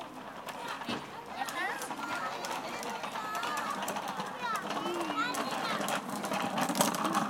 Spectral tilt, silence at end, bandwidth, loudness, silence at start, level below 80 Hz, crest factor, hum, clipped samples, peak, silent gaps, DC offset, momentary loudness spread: -3 dB/octave; 0 s; 17 kHz; -35 LUFS; 0 s; -74 dBFS; 26 dB; none; under 0.1%; -10 dBFS; none; under 0.1%; 9 LU